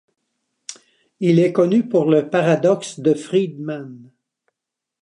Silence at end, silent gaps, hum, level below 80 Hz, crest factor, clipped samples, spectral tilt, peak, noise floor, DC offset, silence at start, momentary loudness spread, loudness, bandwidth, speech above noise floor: 1 s; none; none; -72 dBFS; 18 dB; under 0.1%; -7 dB/octave; -2 dBFS; -84 dBFS; under 0.1%; 0.7 s; 21 LU; -18 LUFS; 11 kHz; 66 dB